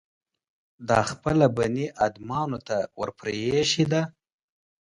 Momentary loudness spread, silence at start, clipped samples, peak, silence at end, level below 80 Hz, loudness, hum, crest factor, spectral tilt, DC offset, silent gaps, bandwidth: 9 LU; 0.8 s; under 0.1%; -6 dBFS; 0.85 s; -54 dBFS; -25 LUFS; none; 22 dB; -5 dB/octave; under 0.1%; none; 11.5 kHz